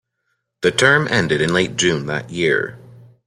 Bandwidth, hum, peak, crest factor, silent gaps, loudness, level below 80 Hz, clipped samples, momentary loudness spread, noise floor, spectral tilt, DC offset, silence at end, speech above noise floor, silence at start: 15 kHz; none; -2 dBFS; 18 dB; none; -17 LUFS; -52 dBFS; under 0.1%; 9 LU; -72 dBFS; -4 dB/octave; under 0.1%; 0.5 s; 55 dB; 0.6 s